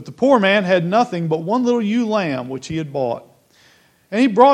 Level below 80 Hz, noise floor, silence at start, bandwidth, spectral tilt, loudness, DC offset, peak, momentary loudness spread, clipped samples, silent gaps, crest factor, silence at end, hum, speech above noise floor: -62 dBFS; -54 dBFS; 0 s; 9.8 kHz; -6.5 dB/octave; -18 LUFS; under 0.1%; 0 dBFS; 12 LU; under 0.1%; none; 18 dB; 0 s; none; 37 dB